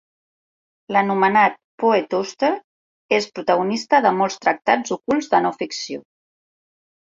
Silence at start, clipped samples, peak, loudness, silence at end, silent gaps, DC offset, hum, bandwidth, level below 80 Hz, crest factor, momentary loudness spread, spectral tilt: 0.9 s; under 0.1%; -2 dBFS; -20 LUFS; 1 s; 1.64-1.78 s, 2.64-3.09 s; under 0.1%; none; 7.8 kHz; -66 dBFS; 18 dB; 10 LU; -4.5 dB/octave